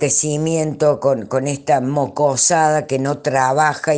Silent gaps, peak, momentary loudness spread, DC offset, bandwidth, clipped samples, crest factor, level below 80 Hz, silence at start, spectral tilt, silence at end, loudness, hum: none; -2 dBFS; 6 LU; under 0.1%; 10.5 kHz; under 0.1%; 16 dB; -56 dBFS; 0 s; -4 dB/octave; 0 s; -17 LUFS; none